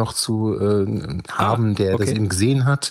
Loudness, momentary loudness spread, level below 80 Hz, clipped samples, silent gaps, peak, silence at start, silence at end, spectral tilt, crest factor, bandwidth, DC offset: -20 LUFS; 5 LU; -50 dBFS; under 0.1%; none; -2 dBFS; 0 s; 0 s; -5.5 dB/octave; 16 dB; 15.5 kHz; under 0.1%